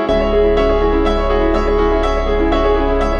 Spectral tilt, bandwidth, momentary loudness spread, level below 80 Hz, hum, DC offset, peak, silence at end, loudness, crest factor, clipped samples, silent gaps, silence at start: -7 dB/octave; 7.4 kHz; 2 LU; -20 dBFS; none; under 0.1%; -2 dBFS; 0 s; -15 LUFS; 10 dB; under 0.1%; none; 0 s